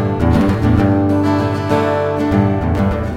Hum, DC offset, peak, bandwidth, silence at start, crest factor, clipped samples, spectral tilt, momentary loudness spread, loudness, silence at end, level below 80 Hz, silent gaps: none; under 0.1%; 0 dBFS; 13 kHz; 0 s; 14 dB; under 0.1%; -8.5 dB/octave; 3 LU; -15 LUFS; 0 s; -30 dBFS; none